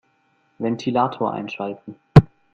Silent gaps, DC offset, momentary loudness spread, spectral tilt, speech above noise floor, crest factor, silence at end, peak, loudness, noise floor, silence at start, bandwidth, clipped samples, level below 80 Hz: none; under 0.1%; 15 LU; -8.5 dB/octave; 40 dB; 20 dB; 0.3 s; 0 dBFS; -20 LUFS; -64 dBFS; 0.6 s; 7 kHz; under 0.1%; -40 dBFS